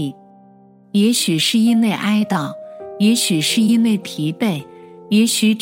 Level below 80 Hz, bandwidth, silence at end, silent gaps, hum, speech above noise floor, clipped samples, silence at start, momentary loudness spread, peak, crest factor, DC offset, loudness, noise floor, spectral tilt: -70 dBFS; 16.5 kHz; 0 s; none; none; 31 dB; under 0.1%; 0 s; 11 LU; -4 dBFS; 12 dB; under 0.1%; -16 LUFS; -47 dBFS; -4 dB/octave